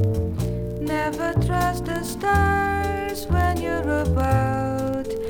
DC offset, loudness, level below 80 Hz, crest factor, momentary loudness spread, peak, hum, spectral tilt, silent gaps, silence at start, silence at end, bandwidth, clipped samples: under 0.1%; -23 LUFS; -34 dBFS; 16 dB; 6 LU; -6 dBFS; none; -6.5 dB/octave; none; 0 s; 0 s; 19 kHz; under 0.1%